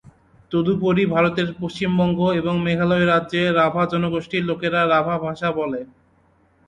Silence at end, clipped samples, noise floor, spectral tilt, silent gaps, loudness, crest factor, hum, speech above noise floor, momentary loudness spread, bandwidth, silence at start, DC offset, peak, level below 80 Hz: 0.85 s; under 0.1%; -59 dBFS; -7.5 dB/octave; none; -20 LUFS; 16 dB; none; 39 dB; 7 LU; 8.8 kHz; 0.5 s; under 0.1%; -6 dBFS; -52 dBFS